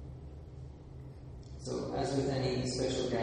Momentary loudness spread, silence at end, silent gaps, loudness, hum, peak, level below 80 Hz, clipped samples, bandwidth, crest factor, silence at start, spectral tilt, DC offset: 17 LU; 0 s; none; -35 LUFS; none; -20 dBFS; -50 dBFS; under 0.1%; 10 kHz; 16 dB; 0 s; -5.5 dB/octave; under 0.1%